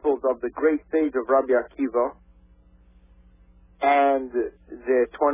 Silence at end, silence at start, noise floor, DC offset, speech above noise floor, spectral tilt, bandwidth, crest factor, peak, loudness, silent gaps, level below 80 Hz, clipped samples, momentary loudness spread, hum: 0 s; 0.05 s; -54 dBFS; under 0.1%; 32 dB; -8.5 dB/octave; 3.8 kHz; 16 dB; -8 dBFS; -23 LUFS; none; -56 dBFS; under 0.1%; 9 LU; none